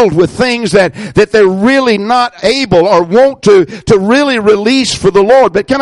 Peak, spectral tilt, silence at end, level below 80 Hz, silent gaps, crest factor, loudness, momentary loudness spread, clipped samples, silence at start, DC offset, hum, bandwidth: 0 dBFS; -5 dB/octave; 0 s; -38 dBFS; none; 8 dB; -9 LUFS; 4 LU; 0.3%; 0 s; under 0.1%; none; 11.5 kHz